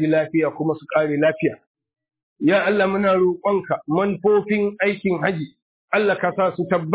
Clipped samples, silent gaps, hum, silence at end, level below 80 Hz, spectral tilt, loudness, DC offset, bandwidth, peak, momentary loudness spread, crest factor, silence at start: under 0.1%; 1.67-1.75 s, 2.23-2.36 s, 5.62-5.88 s; none; 0 s; -60 dBFS; -10.5 dB/octave; -20 LUFS; under 0.1%; 4 kHz; -4 dBFS; 6 LU; 16 dB; 0 s